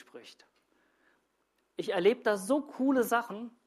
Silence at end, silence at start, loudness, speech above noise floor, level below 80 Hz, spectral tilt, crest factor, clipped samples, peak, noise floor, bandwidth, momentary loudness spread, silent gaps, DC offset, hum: 0.15 s; 0.15 s; -30 LUFS; 46 dB; -80 dBFS; -4.5 dB/octave; 18 dB; under 0.1%; -14 dBFS; -76 dBFS; 15 kHz; 20 LU; none; under 0.1%; none